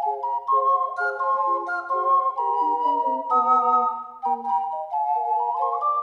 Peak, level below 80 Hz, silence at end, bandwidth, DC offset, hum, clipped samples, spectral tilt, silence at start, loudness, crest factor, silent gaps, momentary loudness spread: -8 dBFS; -80 dBFS; 0 s; 6.8 kHz; under 0.1%; none; under 0.1%; -4 dB/octave; 0 s; -23 LUFS; 14 dB; none; 7 LU